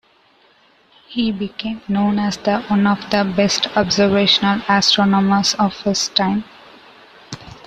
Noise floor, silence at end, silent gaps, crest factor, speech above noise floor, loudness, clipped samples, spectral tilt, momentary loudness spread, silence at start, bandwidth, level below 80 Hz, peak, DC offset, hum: -54 dBFS; 0.15 s; none; 16 dB; 38 dB; -17 LUFS; under 0.1%; -4 dB/octave; 11 LU; 1.1 s; 9.2 kHz; -52 dBFS; -2 dBFS; under 0.1%; none